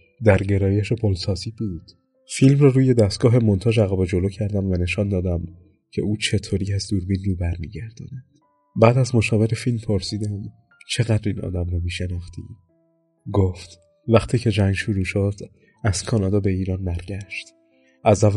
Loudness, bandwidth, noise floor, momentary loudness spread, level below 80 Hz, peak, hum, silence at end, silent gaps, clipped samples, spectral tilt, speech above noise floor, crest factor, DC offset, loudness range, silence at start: -21 LUFS; 11.5 kHz; -64 dBFS; 16 LU; -42 dBFS; 0 dBFS; none; 0 s; none; under 0.1%; -6.5 dB/octave; 44 dB; 20 dB; under 0.1%; 7 LU; 0.2 s